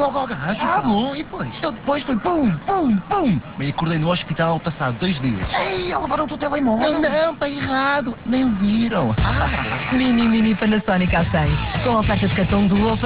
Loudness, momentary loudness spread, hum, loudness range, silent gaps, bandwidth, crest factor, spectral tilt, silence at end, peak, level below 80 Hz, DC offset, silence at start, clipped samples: -20 LUFS; 6 LU; none; 3 LU; none; 4 kHz; 12 dB; -10.5 dB/octave; 0 s; -6 dBFS; -34 dBFS; under 0.1%; 0 s; under 0.1%